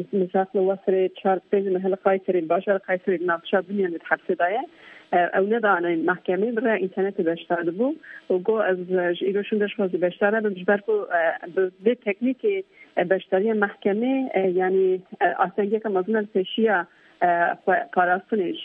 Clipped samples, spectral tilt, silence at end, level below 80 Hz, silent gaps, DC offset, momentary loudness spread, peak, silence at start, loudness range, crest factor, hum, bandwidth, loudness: under 0.1%; -9 dB/octave; 0 s; -76 dBFS; none; under 0.1%; 4 LU; -6 dBFS; 0 s; 1 LU; 18 dB; none; 3.8 kHz; -23 LUFS